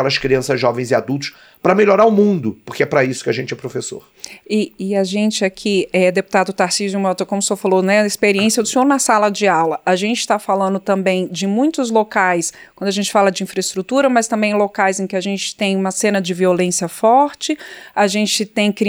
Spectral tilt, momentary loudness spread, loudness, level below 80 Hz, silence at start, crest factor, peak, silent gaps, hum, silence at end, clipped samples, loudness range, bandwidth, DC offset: -4 dB/octave; 8 LU; -16 LUFS; -56 dBFS; 0 s; 16 dB; -2 dBFS; none; none; 0 s; under 0.1%; 3 LU; over 20 kHz; under 0.1%